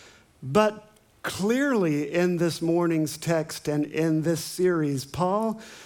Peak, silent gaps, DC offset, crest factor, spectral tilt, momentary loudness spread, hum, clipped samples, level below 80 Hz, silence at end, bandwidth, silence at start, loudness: -8 dBFS; none; under 0.1%; 18 dB; -6 dB/octave; 6 LU; none; under 0.1%; -62 dBFS; 0 s; 19.5 kHz; 0.4 s; -25 LUFS